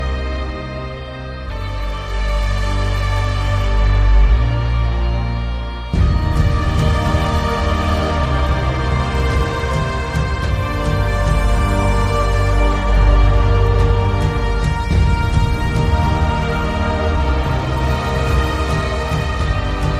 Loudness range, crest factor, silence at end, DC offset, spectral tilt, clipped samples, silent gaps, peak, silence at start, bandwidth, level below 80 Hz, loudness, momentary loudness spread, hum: 2 LU; 14 dB; 0 s; under 0.1%; -6.5 dB/octave; under 0.1%; none; -2 dBFS; 0 s; 10.5 kHz; -18 dBFS; -18 LUFS; 8 LU; none